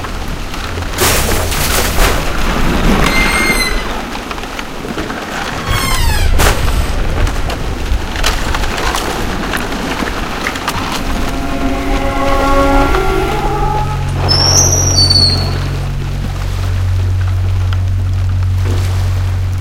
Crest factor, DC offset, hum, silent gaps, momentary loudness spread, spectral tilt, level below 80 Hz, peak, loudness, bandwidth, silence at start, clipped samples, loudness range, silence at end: 12 dB; under 0.1%; none; none; 10 LU; -3.5 dB/octave; -18 dBFS; 0 dBFS; -14 LUFS; 16.5 kHz; 0 s; under 0.1%; 6 LU; 0 s